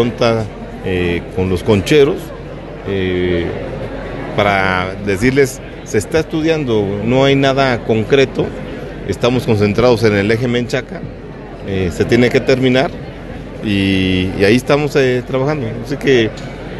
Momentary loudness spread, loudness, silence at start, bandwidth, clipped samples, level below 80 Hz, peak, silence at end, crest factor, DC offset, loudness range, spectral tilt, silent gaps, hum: 15 LU; -15 LUFS; 0 s; 12.5 kHz; under 0.1%; -34 dBFS; 0 dBFS; 0 s; 14 dB; under 0.1%; 2 LU; -6 dB/octave; none; none